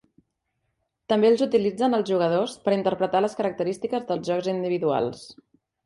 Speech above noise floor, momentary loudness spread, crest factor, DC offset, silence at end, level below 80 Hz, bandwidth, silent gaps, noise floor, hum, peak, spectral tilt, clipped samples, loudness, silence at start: 53 dB; 7 LU; 16 dB; under 0.1%; 0.55 s; -66 dBFS; 11.5 kHz; none; -77 dBFS; none; -8 dBFS; -6 dB/octave; under 0.1%; -24 LUFS; 1.1 s